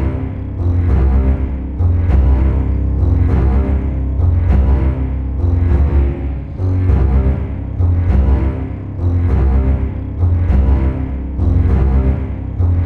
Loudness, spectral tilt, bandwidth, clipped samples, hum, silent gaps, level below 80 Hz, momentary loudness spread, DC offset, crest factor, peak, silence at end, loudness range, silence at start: -16 LUFS; -11 dB/octave; 3.1 kHz; under 0.1%; none; none; -16 dBFS; 7 LU; under 0.1%; 10 dB; -2 dBFS; 0 s; 1 LU; 0 s